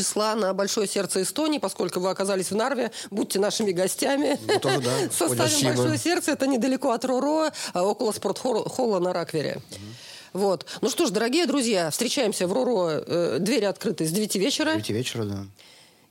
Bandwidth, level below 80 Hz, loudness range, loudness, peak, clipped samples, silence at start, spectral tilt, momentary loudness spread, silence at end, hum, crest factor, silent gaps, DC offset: 17 kHz; -72 dBFS; 3 LU; -24 LUFS; -8 dBFS; under 0.1%; 0 s; -4 dB/octave; 6 LU; 0.6 s; none; 16 dB; none; under 0.1%